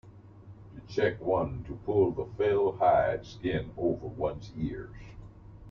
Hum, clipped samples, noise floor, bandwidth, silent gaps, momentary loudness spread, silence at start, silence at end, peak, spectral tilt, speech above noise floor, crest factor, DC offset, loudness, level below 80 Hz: none; under 0.1%; -50 dBFS; 6.8 kHz; none; 23 LU; 0.05 s; 0 s; -12 dBFS; -8 dB/octave; 21 dB; 18 dB; under 0.1%; -30 LUFS; -50 dBFS